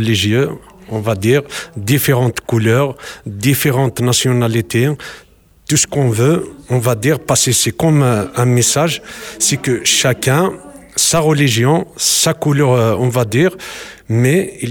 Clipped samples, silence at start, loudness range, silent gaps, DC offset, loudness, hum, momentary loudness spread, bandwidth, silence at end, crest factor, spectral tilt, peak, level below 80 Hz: under 0.1%; 0 s; 2 LU; none; under 0.1%; -14 LUFS; none; 11 LU; 18.5 kHz; 0 s; 12 dB; -4.5 dB/octave; -2 dBFS; -46 dBFS